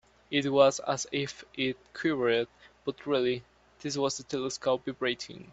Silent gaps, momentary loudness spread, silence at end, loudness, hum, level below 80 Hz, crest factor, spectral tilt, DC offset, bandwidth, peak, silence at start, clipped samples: none; 13 LU; 0 s; -30 LUFS; none; -68 dBFS; 22 dB; -4 dB/octave; under 0.1%; 8.2 kHz; -8 dBFS; 0.3 s; under 0.1%